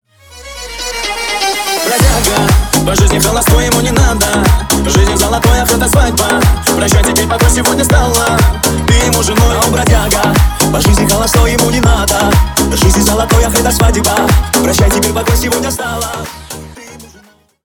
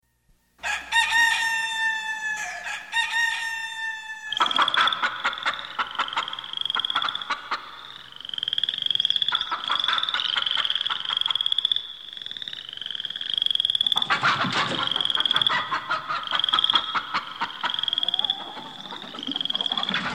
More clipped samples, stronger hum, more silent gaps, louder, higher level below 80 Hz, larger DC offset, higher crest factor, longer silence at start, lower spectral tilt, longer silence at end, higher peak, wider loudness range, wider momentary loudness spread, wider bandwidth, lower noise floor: neither; neither; neither; first, -10 LUFS vs -23 LUFS; first, -16 dBFS vs -64 dBFS; second, under 0.1% vs 0.1%; second, 10 dB vs 20 dB; second, 0.3 s vs 0.6 s; first, -4 dB/octave vs -1 dB/octave; first, 0.6 s vs 0 s; first, 0 dBFS vs -6 dBFS; about the same, 2 LU vs 4 LU; second, 7 LU vs 12 LU; first, over 20 kHz vs 16 kHz; second, -44 dBFS vs -64 dBFS